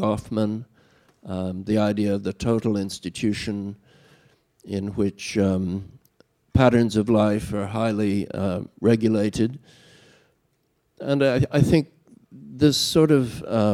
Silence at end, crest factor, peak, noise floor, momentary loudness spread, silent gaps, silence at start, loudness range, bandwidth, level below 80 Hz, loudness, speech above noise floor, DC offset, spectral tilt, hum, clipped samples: 0 s; 20 dB; -4 dBFS; -69 dBFS; 12 LU; none; 0 s; 6 LU; 15.5 kHz; -48 dBFS; -23 LUFS; 47 dB; under 0.1%; -6.5 dB/octave; none; under 0.1%